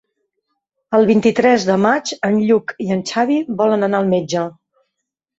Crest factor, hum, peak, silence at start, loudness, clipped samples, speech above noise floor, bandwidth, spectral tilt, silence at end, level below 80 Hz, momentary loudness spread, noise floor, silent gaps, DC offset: 16 dB; none; -2 dBFS; 0.9 s; -16 LUFS; under 0.1%; 63 dB; 8 kHz; -5.5 dB/octave; 0.9 s; -58 dBFS; 8 LU; -78 dBFS; none; under 0.1%